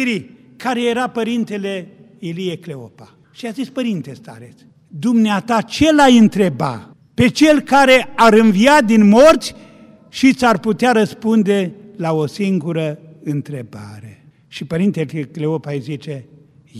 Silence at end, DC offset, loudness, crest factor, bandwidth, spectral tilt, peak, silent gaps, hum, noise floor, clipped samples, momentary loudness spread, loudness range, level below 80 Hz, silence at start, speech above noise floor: 0 s; under 0.1%; -15 LUFS; 16 dB; 14.5 kHz; -5.5 dB/octave; 0 dBFS; none; none; -40 dBFS; under 0.1%; 20 LU; 12 LU; -48 dBFS; 0 s; 25 dB